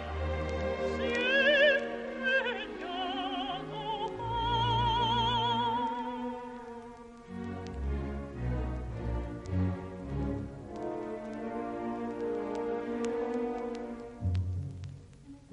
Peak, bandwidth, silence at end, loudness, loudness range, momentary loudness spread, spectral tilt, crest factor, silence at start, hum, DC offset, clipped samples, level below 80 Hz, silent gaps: -14 dBFS; 10.5 kHz; 0 s; -33 LUFS; 8 LU; 14 LU; -6 dB/octave; 18 dB; 0 s; none; under 0.1%; under 0.1%; -44 dBFS; none